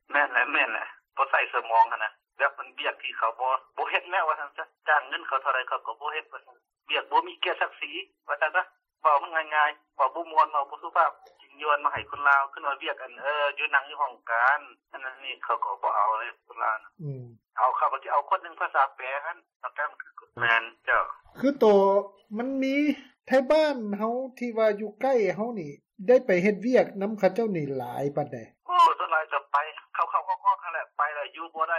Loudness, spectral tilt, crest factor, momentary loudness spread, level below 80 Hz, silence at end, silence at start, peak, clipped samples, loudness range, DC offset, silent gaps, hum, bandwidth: -26 LUFS; -5.5 dB/octave; 18 dB; 12 LU; -72 dBFS; 0 s; 0.1 s; -8 dBFS; under 0.1%; 4 LU; under 0.1%; 19.56-19.60 s; none; 14 kHz